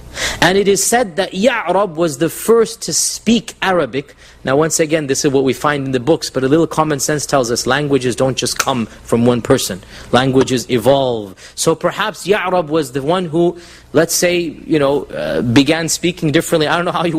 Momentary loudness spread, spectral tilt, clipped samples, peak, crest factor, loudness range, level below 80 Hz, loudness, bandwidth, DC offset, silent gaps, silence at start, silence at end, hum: 6 LU; -4 dB/octave; under 0.1%; 0 dBFS; 16 dB; 1 LU; -44 dBFS; -15 LUFS; 16 kHz; under 0.1%; none; 0.05 s; 0 s; none